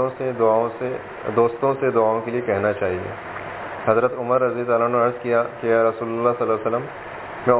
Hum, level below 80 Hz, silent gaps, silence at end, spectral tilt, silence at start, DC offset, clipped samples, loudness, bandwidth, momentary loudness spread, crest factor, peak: none; -54 dBFS; none; 0 s; -10.5 dB/octave; 0 s; under 0.1%; under 0.1%; -21 LUFS; 4 kHz; 12 LU; 20 dB; -2 dBFS